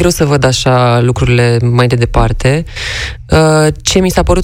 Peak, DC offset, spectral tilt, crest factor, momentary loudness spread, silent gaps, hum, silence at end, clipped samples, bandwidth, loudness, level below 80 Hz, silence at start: 0 dBFS; under 0.1%; -5.5 dB/octave; 10 dB; 6 LU; none; none; 0 s; 0.4%; 16 kHz; -10 LUFS; -22 dBFS; 0 s